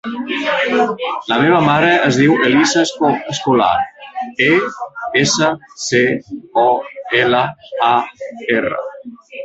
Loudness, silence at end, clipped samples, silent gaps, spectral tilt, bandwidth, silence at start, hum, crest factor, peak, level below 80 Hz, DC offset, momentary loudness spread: -15 LUFS; 0 s; under 0.1%; none; -4 dB/octave; 8.2 kHz; 0.05 s; none; 14 dB; 0 dBFS; -54 dBFS; under 0.1%; 13 LU